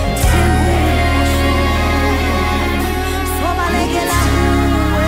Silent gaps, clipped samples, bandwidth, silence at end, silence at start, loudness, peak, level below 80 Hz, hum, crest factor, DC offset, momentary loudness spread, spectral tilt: none; under 0.1%; 16.5 kHz; 0 s; 0 s; -15 LUFS; -2 dBFS; -18 dBFS; none; 12 dB; under 0.1%; 4 LU; -5.5 dB/octave